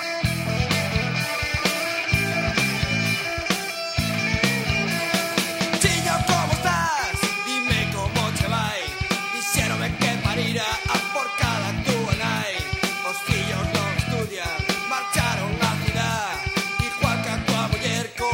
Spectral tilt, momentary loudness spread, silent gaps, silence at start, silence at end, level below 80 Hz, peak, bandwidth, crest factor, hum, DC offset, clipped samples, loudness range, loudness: -4 dB/octave; 4 LU; none; 0 s; 0 s; -40 dBFS; -4 dBFS; 16 kHz; 18 dB; none; under 0.1%; under 0.1%; 2 LU; -23 LUFS